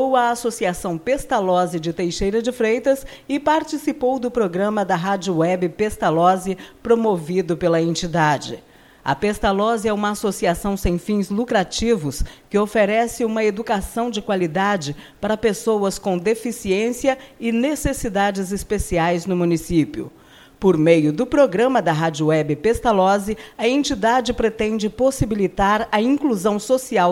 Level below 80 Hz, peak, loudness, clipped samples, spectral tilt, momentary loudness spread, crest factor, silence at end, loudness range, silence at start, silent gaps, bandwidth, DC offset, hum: -38 dBFS; -2 dBFS; -20 LUFS; under 0.1%; -5.5 dB/octave; 7 LU; 18 dB; 0 s; 3 LU; 0 s; none; 16.5 kHz; under 0.1%; none